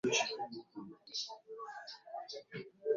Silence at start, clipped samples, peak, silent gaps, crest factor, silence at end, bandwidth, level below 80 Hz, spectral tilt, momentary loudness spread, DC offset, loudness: 0.05 s; under 0.1%; -18 dBFS; none; 22 dB; 0 s; 7.4 kHz; -84 dBFS; -1.5 dB/octave; 14 LU; under 0.1%; -42 LUFS